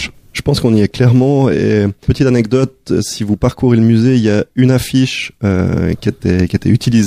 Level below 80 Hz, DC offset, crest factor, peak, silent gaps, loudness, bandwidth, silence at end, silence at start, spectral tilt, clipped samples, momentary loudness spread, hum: -36 dBFS; under 0.1%; 12 dB; 0 dBFS; none; -13 LUFS; 15.5 kHz; 0 s; 0 s; -7 dB/octave; under 0.1%; 7 LU; none